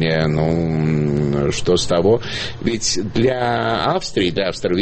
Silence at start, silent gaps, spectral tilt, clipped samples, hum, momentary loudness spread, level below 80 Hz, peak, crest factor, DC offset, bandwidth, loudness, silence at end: 0 s; none; -5 dB/octave; under 0.1%; none; 4 LU; -38 dBFS; -4 dBFS; 14 dB; under 0.1%; 8.8 kHz; -18 LUFS; 0 s